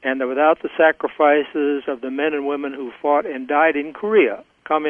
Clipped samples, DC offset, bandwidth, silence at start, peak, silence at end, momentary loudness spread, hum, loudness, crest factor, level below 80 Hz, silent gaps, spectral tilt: under 0.1%; under 0.1%; 3.6 kHz; 0.05 s; -2 dBFS; 0 s; 9 LU; none; -19 LUFS; 16 dB; -66 dBFS; none; -7 dB/octave